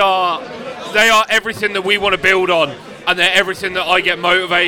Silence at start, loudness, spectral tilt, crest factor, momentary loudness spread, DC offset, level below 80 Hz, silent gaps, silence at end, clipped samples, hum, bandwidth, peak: 0 s; -14 LUFS; -2.5 dB/octave; 16 dB; 9 LU; under 0.1%; -48 dBFS; none; 0 s; under 0.1%; none; over 20 kHz; 0 dBFS